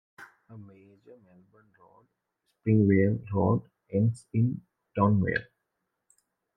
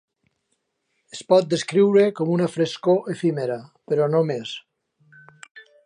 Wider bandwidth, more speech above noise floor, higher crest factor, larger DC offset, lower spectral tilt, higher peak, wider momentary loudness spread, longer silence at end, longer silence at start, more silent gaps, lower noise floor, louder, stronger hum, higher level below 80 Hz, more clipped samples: about the same, 9.6 kHz vs 10.5 kHz; about the same, 55 dB vs 53 dB; about the same, 20 dB vs 18 dB; neither; first, -9.5 dB/octave vs -6 dB/octave; second, -10 dBFS vs -4 dBFS; about the same, 15 LU vs 16 LU; first, 1.15 s vs 0.25 s; second, 0.2 s vs 1.15 s; second, none vs 5.51-5.55 s; first, -82 dBFS vs -74 dBFS; second, -27 LUFS vs -21 LUFS; neither; first, -64 dBFS vs -72 dBFS; neither